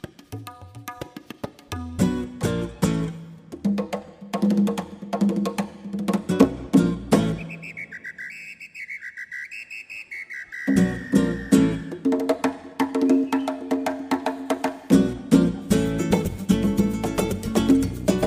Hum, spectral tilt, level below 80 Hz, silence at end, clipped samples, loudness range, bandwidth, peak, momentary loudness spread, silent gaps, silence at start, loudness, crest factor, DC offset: none; -6.5 dB/octave; -44 dBFS; 0 s; under 0.1%; 6 LU; 16 kHz; -2 dBFS; 17 LU; none; 0.05 s; -24 LUFS; 22 dB; under 0.1%